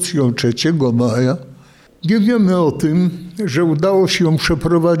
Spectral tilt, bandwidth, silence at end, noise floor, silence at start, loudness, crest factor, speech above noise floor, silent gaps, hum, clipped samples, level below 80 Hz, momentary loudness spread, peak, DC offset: -6 dB/octave; 14.5 kHz; 0 s; -44 dBFS; 0 s; -16 LUFS; 10 dB; 29 dB; none; none; under 0.1%; -42 dBFS; 6 LU; -4 dBFS; under 0.1%